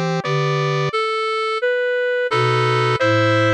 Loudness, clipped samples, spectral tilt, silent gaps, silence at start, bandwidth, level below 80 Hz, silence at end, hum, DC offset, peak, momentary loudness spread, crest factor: -18 LUFS; under 0.1%; -6 dB/octave; none; 0 s; 11 kHz; -62 dBFS; 0 s; none; under 0.1%; -6 dBFS; 4 LU; 12 dB